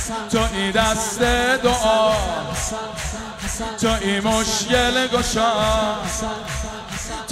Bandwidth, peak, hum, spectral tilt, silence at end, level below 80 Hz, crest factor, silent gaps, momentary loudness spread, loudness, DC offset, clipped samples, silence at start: 16 kHz; -4 dBFS; none; -3 dB/octave; 0 s; -32 dBFS; 16 dB; none; 11 LU; -20 LUFS; under 0.1%; under 0.1%; 0 s